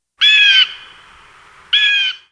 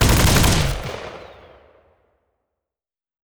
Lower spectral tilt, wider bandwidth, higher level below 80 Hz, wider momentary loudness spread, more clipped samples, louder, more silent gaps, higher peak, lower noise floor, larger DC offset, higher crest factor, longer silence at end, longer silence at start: second, 4 dB/octave vs -4 dB/octave; second, 10.5 kHz vs over 20 kHz; second, -60 dBFS vs -28 dBFS; second, 8 LU vs 21 LU; neither; first, -10 LUFS vs -18 LUFS; neither; first, 0 dBFS vs -6 dBFS; second, -44 dBFS vs under -90 dBFS; neither; about the same, 16 dB vs 16 dB; second, 0.15 s vs 2 s; first, 0.2 s vs 0 s